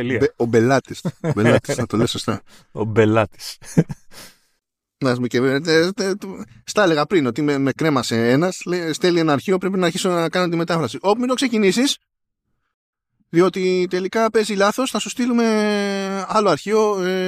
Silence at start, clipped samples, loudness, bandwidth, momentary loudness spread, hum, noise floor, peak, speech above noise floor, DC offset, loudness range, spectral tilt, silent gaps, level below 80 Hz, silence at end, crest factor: 0 s; under 0.1%; -19 LUFS; 15.5 kHz; 8 LU; none; -74 dBFS; -2 dBFS; 55 dB; under 0.1%; 3 LU; -5.5 dB/octave; 12.74-12.93 s; -56 dBFS; 0 s; 18 dB